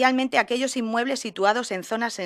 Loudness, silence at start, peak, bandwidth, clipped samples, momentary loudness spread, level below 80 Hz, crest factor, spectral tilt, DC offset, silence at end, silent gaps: -24 LUFS; 0 s; -4 dBFS; 15 kHz; under 0.1%; 6 LU; -72 dBFS; 20 dB; -3 dB/octave; under 0.1%; 0 s; none